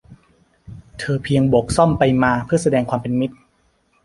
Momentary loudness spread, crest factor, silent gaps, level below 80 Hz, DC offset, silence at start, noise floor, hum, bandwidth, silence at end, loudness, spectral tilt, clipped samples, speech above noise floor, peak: 10 LU; 18 dB; none; -42 dBFS; under 0.1%; 0.1 s; -61 dBFS; none; 11.5 kHz; 0.7 s; -18 LUFS; -6.5 dB/octave; under 0.1%; 44 dB; -2 dBFS